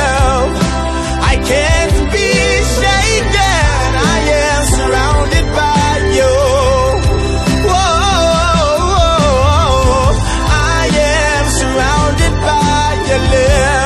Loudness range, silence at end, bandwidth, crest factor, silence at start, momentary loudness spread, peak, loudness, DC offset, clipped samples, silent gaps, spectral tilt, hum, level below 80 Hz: 1 LU; 0 s; 13.5 kHz; 10 dB; 0 s; 3 LU; 0 dBFS; -12 LUFS; under 0.1%; under 0.1%; none; -4.5 dB/octave; none; -16 dBFS